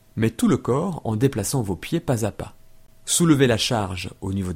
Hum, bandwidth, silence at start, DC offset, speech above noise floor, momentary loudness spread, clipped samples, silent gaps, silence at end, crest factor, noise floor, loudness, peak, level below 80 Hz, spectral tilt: none; 16.5 kHz; 0.15 s; under 0.1%; 25 dB; 12 LU; under 0.1%; none; 0 s; 18 dB; -47 dBFS; -22 LUFS; -4 dBFS; -46 dBFS; -5 dB/octave